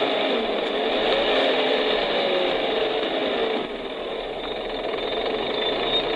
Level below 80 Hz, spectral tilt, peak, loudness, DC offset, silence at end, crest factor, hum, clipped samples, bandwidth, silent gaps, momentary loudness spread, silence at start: -50 dBFS; -4.5 dB/octave; -8 dBFS; -23 LUFS; under 0.1%; 0 s; 16 dB; none; under 0.1%; 11 kHz; none; 9 LU; 0 s